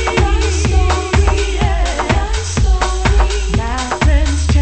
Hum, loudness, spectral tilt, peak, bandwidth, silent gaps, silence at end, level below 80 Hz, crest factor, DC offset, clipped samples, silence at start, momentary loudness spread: none; -15 LUFS; -5 dB/octave; 0 dBFS; 8.8 kHz; none; 0 s; -14 dBFS; 14 dB; under 0.1%; under 0.1%; 0 s; 4 LU